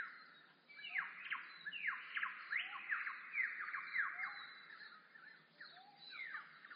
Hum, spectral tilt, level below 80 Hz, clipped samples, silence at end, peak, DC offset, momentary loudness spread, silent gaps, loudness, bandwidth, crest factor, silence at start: none; 3.5 dB/octave; under -90 dBFS; under 0.1%; 0 s; -28 dBFS; under 0.1%; 18 LU; none; -44 LUFS; 5.2 kHz; 20 dB; 0 s